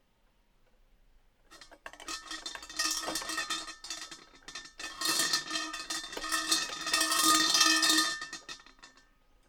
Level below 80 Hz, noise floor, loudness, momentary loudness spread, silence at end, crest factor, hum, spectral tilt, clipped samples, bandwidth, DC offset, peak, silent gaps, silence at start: -64 dBFS; -69 dBFS; -28 LUFS; 23 LU; 0.6 s; 26 dB; none; 1 dB/octave; under 0.1%; over 20 kHz; under 0.1%; -8 dBFS; none; 1.5 s